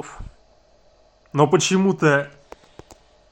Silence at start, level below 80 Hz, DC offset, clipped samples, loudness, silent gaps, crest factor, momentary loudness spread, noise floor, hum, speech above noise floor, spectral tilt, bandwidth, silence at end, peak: 0.05 s; -48 dBFS; under 0.1%; under 0.1%; -19 LUFS; none; 20 dB; 20 LU; -56 dBFS; none; 38 dB; -5 dB/octave; 12 kHz; 1.05 s; -2 dBFS